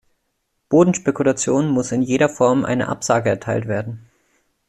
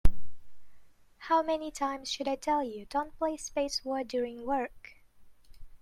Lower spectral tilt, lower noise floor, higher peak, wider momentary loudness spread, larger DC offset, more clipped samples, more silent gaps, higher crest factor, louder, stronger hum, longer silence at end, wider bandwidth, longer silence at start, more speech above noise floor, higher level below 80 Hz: about the same, -5.5 dB/octave vs -4.5 dB/octave; first, -71 dBFS vs -54 dBFS; first, -2 dBFS vs -8 dBFS; about the same, 8 LU vs 7 LU; neither; neither; neither; second, 16 dB vs 22 dB; first, -18 LUFS vs -33 LUFS; neither; first, 0.7 s vs 0.05 s; about the same, 12.5 kHz vs 12.5 kHz; first, 0.7 s vs 0.05 s; first, 54 dB vs 22 dB; second, -56 dBFS vs -40 dBFS